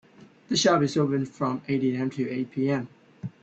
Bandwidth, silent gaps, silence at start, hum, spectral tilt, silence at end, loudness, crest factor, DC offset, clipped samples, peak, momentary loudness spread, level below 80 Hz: 8.6 kHz; none; 0.2 s; none; -5 dB/octave; 0.1 s; -26 LUFS; 18 dB; under 0.1%; under 0.1%; -8 dBFS; 11 LU; -66 dBFS